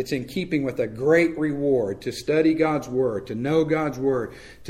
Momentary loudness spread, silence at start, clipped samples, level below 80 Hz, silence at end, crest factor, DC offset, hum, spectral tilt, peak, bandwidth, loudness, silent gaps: 8 LU; 0 s; under 0.1%; -52 dBFS; 0 s; 16 dB; under 0.1%; none; -6.5 dB/octave; -6 dBFS; 15 kHz; -23 LUFS; none